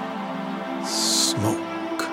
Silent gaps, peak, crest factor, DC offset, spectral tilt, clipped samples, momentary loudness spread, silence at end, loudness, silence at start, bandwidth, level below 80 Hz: none; -8 dBFS; 18 dB; under 0.1%; -2.5 dB/octave; under 0.1%; 11 LU; 0 s; -24 LUFS; 0 s; 16 kHz; -68 dBFS